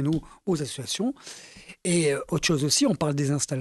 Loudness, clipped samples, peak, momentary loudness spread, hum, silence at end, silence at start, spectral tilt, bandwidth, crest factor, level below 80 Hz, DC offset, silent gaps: -25 LUFS; under 0.1%; -10 dBFS; 17 LU; none; 0 s; 0 s; -4.5 dB/octave; 12 kHz; 16 dB; -54 dBFS; under 0.1%; none